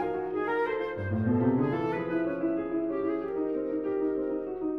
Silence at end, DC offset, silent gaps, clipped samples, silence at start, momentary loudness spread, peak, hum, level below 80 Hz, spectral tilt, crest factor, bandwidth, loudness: 0 s; under 0.1%; none; under 0.1%; 0 s; 5 LU; -14 dBFS; none; -58 dBFS; -10 dB/octave; 14 dB; 5.2 kHz; -30 LUFS